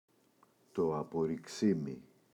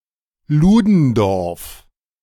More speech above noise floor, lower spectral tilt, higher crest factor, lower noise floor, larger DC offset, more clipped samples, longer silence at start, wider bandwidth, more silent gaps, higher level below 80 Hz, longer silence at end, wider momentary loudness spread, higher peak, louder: about the same, 35 dB vs 33 dB; about the same, -7 dB/octave vs -8 dB/octave; about the same, 18 dB vs 14 dB; first, -69 dBFS vs -47 dBFS; neither; neither; first, 0.75 s vs 0.5 s; second, 13 kHz vs 17.5 kHz; neither; second, -70 dBFS vs -36 dBFS; second, 0.35 s vs 0.5 s; second, 11 LU vs 17 LU; second, -18 dBFS vs -2 dBFS; second, -36 LUFS vs -15 LUFS